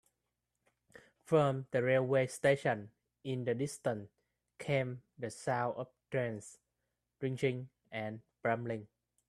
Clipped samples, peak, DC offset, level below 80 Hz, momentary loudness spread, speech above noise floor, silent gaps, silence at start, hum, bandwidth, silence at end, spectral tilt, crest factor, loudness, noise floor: under 0.1%; -16 dBFS; under 0.1%; -74 dBFS; 14 LU; 52 dB; none; 1.3 s; 60 Hz at -65 dBFS; 13 kHz; 0.45 s; -6 dB/octave; 20 dB; -36 LUFS; -87 dBFS